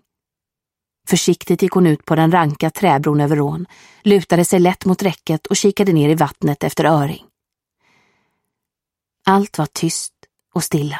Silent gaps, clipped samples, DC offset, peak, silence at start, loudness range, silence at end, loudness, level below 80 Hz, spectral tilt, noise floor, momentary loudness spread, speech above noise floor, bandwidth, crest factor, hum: none; under 0.1%; under 0.1%; 0 dBFS; 1.05 s; 6 LU; 0 s; -16 LUFS; -54 dBFS; -5.5 dB/octave; -86 dBFS; 9 LU; 70 dB; 16.5 kHz; 16 dB; none